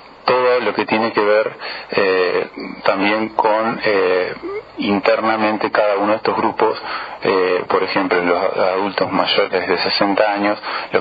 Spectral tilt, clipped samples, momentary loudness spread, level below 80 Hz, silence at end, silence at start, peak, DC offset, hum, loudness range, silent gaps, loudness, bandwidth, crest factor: -7.5 dB/octave; under 0.1%; 6 LU; -58 dBFS; 0 s; 0 s; 0 dBFS; under 0.1%; none; 1 LU; none; -17 LUFS; 5.2 kHz; 18 dB